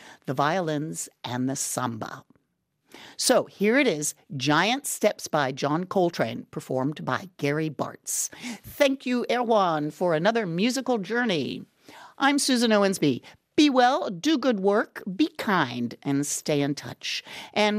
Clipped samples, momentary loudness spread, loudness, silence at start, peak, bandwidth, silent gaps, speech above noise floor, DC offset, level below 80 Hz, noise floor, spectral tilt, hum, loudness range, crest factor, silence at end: under 0.1%; 11 LU; -25 LUFS; 0.05 s; -8 dBFS; 15.5 kHz; none; 49 dB; under 0.1%; -70 dBFS; -75 dBFS; -4 dB/octave; none; 5 LU; 18 dB; 0 s